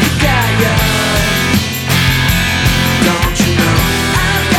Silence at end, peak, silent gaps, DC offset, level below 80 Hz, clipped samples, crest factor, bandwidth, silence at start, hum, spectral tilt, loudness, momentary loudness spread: 0 s; 0 dBFS; none; under 0.1%; -22 dBFS; under 0.1%; 12 dB; 19 kHz; 0 s; none; -4 dB/octave; -12 LUFS; 1 LU